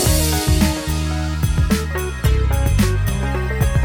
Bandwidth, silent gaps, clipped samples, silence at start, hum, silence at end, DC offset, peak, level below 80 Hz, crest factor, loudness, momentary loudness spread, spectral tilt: 17 kHz; none; under 0.1%; 0 s; none; 0 s; under 0.1%; -2 dBFS; -20 dBFS; 16 dB; -19 LUFS; 5 LU; -5 dB/octave